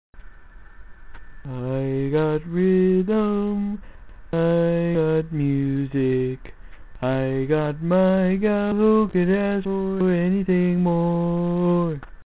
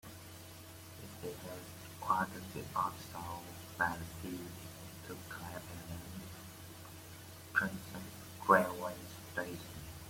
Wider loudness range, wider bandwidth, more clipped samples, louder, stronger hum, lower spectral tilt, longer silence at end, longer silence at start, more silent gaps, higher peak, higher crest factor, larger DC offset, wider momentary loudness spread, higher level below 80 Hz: second, 3 LU vs 7 LU; second, 4 kHz vs 16.5 kHz; neither; first, -22 LUFS vs -39 LUFS; neither; first, -12.5 dB/octave vs -4.5 dB/octave; about the same, 0.05 s vs 0 s; about the same, 0.15 s vs 0.05 s; neither; first, -8 dBFS vs -12 dBFS; second, 14 dB vs 28 dB; first, 0.4% vs under 0.1%; second, 9 LU vs 16 LU; first, -44 dBFS vs -66 dBFS